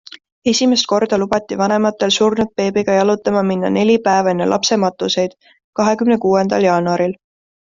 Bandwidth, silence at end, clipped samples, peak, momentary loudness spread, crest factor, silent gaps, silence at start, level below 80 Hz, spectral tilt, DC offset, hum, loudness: 7.6 kHz; 0.55 s; under 0.1%; -2 dBFS; 5 LU; 14 dB; 5.64-5.73 s; 0.45 s; -54 dBFS; -4.5 dB/octave; under 0.1%; none; -16 LUFS